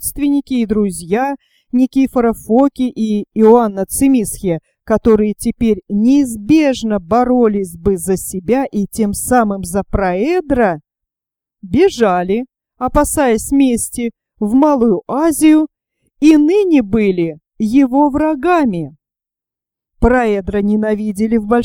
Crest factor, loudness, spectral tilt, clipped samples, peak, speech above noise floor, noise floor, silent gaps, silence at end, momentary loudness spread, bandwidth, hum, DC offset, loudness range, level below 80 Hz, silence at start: 14 dB; -14 LUFS; -5.5 dB/octave; under 0.1%; 0 dBFS; 74 dB; -87 dBFS; none; 0 s; 8 LU; 18 kHz; none; under 0.1%; 3 LU; -34 dBFS; 0 s